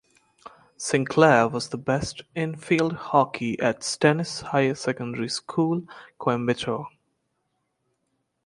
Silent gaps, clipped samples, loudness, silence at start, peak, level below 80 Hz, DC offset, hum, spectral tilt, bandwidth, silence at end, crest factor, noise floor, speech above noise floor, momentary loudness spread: none; under 0.1%; -24 LUFS; 0.45 s; -2 dBFS; -60 dBFS; under 0.1%; none; -5 dB/octave; 11.5 kHz; 1.6 s; 22 dB; -75 dBFS; 51 dB; 11 LU